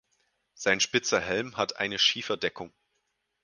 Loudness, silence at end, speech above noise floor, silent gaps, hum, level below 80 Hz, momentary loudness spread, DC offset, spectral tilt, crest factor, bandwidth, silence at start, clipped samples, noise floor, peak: -27 LUFS; 0.75 s; 49 dB; none; none; -64 dBFS; 9 LU; under 0.1%; -2 dB/octave; 22 dB; 10.5 kHz; 0.6 s; under 0.1%; -78 dBFS; -8 dBFS